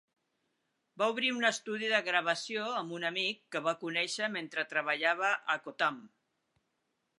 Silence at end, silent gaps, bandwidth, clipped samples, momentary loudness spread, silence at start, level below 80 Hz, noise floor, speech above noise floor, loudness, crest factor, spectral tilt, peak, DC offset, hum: 1.15 s; none; 11 kHz; under 0.1%; 6 LU; 0.95 s; -90 dBFS; -81 dBFS; 48 dB; -32 LUFS; 22 dB; -2.5 dB/octave; -12 dBFS; under 0.1%; none